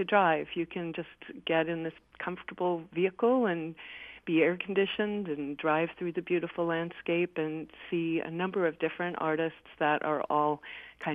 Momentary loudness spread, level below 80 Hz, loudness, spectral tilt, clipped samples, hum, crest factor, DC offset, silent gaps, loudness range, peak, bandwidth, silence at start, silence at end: 12 LU; -70 dBFS; -31 LUFS; -8.5 dB/octave; under 0.1%; none; 20 dB; under 0.1%; none; 2 LU; -10 dBFS; 3.8 kHz; 0 s; 0 s